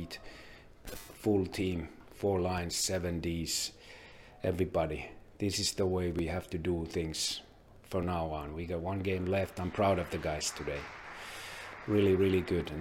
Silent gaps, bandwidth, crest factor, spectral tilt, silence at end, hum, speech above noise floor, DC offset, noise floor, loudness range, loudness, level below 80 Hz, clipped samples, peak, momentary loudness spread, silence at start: none; 16.5 kHz; 18 dB; -4.5 dB/octave; 0 s; none; 21 dB; under 0.1%; -53 dBFS; 2 LU; -34 LUFS; -52 dBFS; under 0.1%; -16 dBFS; 16 LU; 0 s